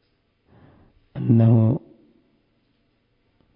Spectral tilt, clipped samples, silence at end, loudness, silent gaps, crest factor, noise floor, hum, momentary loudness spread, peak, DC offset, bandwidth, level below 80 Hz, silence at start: -14.5 dB/octave; under 0.1%; 1.75 s; -19 LUFS; none; 18 dB; -67 dBFS; none; 15 LU; -4 dBFS; under 0.1%; 3.7 kHz; -56 dBFS; 1.15 s